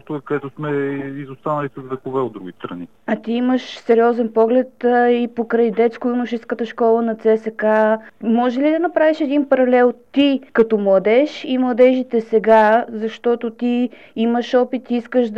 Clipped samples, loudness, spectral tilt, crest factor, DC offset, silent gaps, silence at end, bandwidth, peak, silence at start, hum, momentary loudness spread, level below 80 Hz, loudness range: under 0.1%; -17 LUFS; -7 dB/octave; 14 dB; 0.2%; none; 0 s; 7.2 kHz; -4 dBFS; 0.1 s; none; 11 LU; -64 dBFS; 5 LU